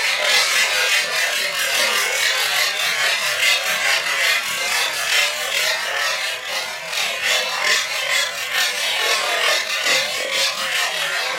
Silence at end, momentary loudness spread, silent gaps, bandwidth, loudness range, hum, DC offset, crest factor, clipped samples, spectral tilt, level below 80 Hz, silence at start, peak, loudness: 0 s; 4 LU; none; 16 kHz; 2 LU; none; under 0.1%; 18 dB; under 0.1%; 2 dB/octave; -66 dBFS; 0 s; -2 dBFS; -17 LUFS